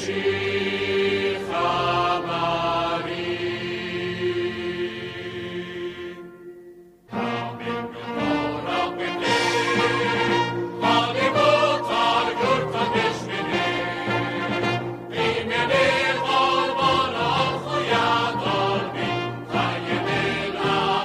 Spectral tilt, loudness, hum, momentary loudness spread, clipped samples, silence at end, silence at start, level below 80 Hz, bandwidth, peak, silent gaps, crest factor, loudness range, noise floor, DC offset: -5 dB/octave; -23 LUFS; none; 10 LU; under 0.1%; 0 s; 0 s; -56 dBFS; 15 kHz; -6 dBFS; none; 16 dB; 9 LU; -46 dBFS; under 0.1%